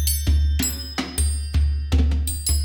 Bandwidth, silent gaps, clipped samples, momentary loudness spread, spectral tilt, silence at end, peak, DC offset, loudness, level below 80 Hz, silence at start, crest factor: over 20 kHz; none; under 0.1%; 3 LU; -4 dB/octave; 0 s; -8 dBFS; under 0.1%; -22 LUFS; -22 dBFS; 0 s; 14 dB